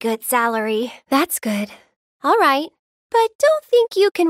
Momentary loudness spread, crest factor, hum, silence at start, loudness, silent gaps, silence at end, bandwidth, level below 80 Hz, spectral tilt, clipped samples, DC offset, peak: 9 LU; 14 dB; none; 0 s; -18 LUFS; 1.96-2.20 s, 2.79-3.10 s, 3.35-3.39 s, 4.11-4.15 s; 0 s; 16 kHz; -70 dBFS; -3 dB/octave; under 0.1%; under 0.1%; -4 dBFS